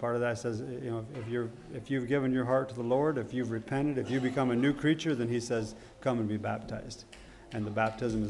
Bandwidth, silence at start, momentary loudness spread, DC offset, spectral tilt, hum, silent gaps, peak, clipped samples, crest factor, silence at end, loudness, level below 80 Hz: 11.5 kHz; 0 s; 12 LU; under 0.1%; -6.5 dB/octave; none; none; -16 dBFS; under 0.1%; 16 dB; 0 s; -32 LUFS; -58 dBFS